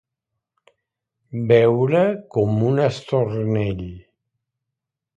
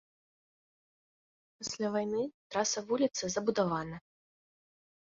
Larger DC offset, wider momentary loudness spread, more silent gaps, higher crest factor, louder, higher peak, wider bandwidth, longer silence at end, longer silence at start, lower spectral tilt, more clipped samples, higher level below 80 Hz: neither; first, 13 LU vs 10 LU; second, none vs 2.34-2.50 s; about the same, 20 dB vs 20 dB; first, -19 LUFS vs -33 LUFS; first, -2 dBFS vs -16 dBFS; first, 8.6 kHz vs 7.6 kHz; about the same, 1.15 s vs 1.15 s; second, 1.3 s vs 1.6 s; first, -8.5 dB/octave vs -4 dB/octave; neither; first, -50 dBFS vs -70 dBFS